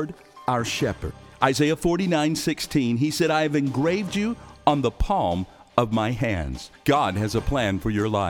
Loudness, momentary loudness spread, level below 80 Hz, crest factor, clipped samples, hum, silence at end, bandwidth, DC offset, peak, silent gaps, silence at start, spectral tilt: -24 LUFS; 7 LU; -40 dBFS; 22 dB; under 0.1%; none; 0 s; 18.5 kHz; under 0.1%; -2 dBFS; none; 0 s; -5.5 dB/octave